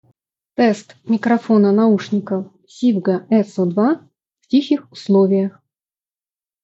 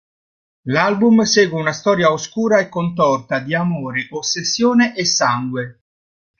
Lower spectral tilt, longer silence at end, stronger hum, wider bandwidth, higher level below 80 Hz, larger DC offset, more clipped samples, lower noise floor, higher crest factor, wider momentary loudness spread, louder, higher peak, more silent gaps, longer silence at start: first, -7.5 dB/octave vs -4 dB/octave; first, 1.15 s vs 0.7 s; neither; about the same, 8 kHz vs 7.4 kHz; second, -70 dBFS vs -58 dBFS; neither; neither; about the same, under -90 dBFS vs under -90 dBFS; about the same, 14 dB vs 16 dB; about the same, 11 LU vs 9 LU; about the same, -17 LUFS vs -17 LUFS; about the same, -4 dBFS vs -2 dBFS; neither; about the same, 0.6 s vs 0.65 s